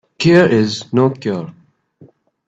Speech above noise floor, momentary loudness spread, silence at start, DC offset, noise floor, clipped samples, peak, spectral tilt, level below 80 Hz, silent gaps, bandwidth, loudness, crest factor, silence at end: 34 dB; 14 LU; 0.2 s; under 0.1%; -48 dBFS; under 0.1%; 0 dBFS; -6.5 dB/octave; -54 dBFS; none; 8 kHz; -14 LUFS; 16 dB; 0.95 s